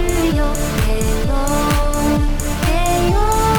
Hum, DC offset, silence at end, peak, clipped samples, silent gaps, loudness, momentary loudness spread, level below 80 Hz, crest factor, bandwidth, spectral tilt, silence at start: none; under 0.1%; 0 s; -2 dBFS; under 0.1%; none; -18 LUFS; 3 LU; -18 dBFS; 12 dB; over 20 kHz; -5 dB/octave; 0 s